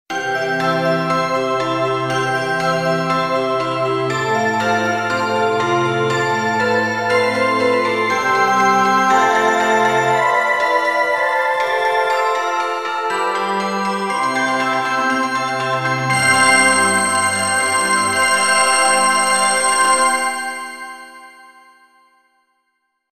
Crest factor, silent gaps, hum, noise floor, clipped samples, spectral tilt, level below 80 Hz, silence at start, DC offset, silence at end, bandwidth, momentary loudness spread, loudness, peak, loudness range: 16 dB; none; none; -70 dBFS; under 0.1%; -2.5 dB/octave; -62 dBFS; 0.1 s; 0.2%; 1.65 s; 16 kHz; 6 LU; -16 LUFS; 0 dBFS; 4 LU